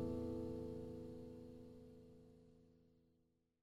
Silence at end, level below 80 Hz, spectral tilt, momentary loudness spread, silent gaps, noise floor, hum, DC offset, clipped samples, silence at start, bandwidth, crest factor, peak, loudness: 0.65 s; -66 dBFS; -9 dB/octave; 20 LU; none; -81 dBFS; none; under 0.1%; under 0.1%; 0 s; 14.5 kHz; 16 dB; -34 dBFS; -50 LUFS